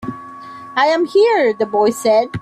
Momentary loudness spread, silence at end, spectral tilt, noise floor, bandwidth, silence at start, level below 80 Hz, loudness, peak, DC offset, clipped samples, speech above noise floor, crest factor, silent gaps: 19 LU; 0 s; -4.5 dB/octave; -34 dBFS; 14 kHz; 0 s; -54 dBFS; -15 LUFS; -4 dBFS; under 0.1%; under 0.1%; 20 dB; 12 dB; none